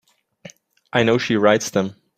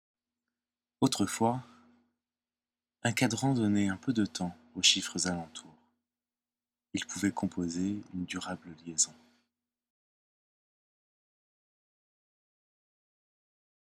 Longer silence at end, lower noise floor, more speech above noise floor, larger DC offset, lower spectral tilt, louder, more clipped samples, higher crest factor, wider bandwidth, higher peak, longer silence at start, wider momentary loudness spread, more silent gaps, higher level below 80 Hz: second, 0.25 s vs 4.7 s; second, -45 dBFS vs under -90 dBFS; second, 27 dB vs over 59 dB; neither; about the same, -4.5 dB/octave vs -3.5 dB/octave; first, -19 LUFS vs -31 LUFS; neither; second, 18 dB vs 26 dB; about the same, 15.5 kHz vs 16 kHz; first, -2 dBFS vs -10 dBFS; second, 0.45 s vs 1 s; second, 7 LU vs 13 LU; neither; first, -58 dBFS vs -70 dBFS